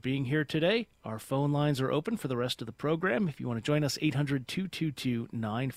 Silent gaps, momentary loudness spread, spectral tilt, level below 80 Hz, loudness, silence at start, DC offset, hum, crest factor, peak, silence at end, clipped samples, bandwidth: none; 6 LU; -6 dB/octave; -62 dBFS; -31 LUFS; 0.05 s; under 0.1%; none; 16 dB; -16 dBFS; 0 s; under 0.1%; 15.5 kHz